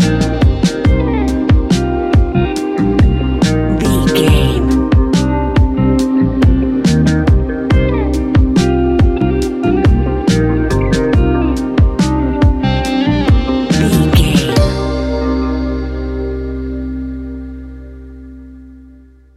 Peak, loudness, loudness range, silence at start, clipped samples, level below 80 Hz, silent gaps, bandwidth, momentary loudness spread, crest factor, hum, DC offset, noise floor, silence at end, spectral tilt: 0 dBFS; -13 LUFS; 7 LU; 0 s; under 0.1%; -18 dBFS; none; 14 kHz; 10 LU; 12 dB; none; under 0.1%; -41 dBFS; 0.55 s; -7 dB/octave